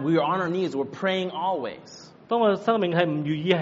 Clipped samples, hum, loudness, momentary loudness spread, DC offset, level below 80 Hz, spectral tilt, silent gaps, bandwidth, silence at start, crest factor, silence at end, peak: under 0.1%; none; -25 LUFS; 12 LU; under 0.1%; -70 dBFS; -4.5 dB/octave; none; 7.6 kHz; 0 s; 20 dB; 0 s; -6 dBFS